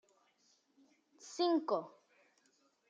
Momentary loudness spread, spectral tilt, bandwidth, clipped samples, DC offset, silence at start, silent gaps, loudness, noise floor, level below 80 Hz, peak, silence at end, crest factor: 23 LU; -4 dB/octave; 8.6 kHz; under 0.1%; under 0.1%; 1.25 s; none; -36 LUFS; -75 dBFS; under -90 dBFS; -22 dBFS; 1 s; 20 dB